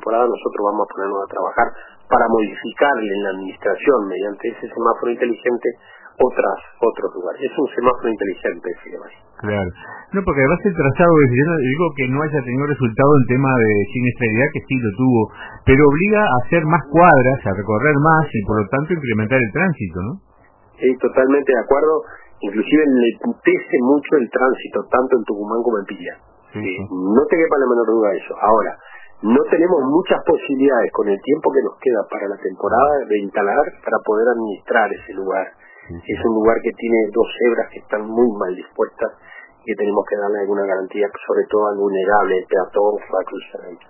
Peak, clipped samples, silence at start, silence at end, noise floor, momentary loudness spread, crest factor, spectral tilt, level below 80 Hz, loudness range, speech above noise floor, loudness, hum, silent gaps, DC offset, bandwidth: 0 dBFS; under 0.1%; 0.05 s; 0.15 s; -51 dBFS; 11 LU; 18 dB; -11.5 dB/octave; -44 dBFS; 5 LU; 34 dB; -17 LUFS; none; none; under 0.1%; 3.1 kHz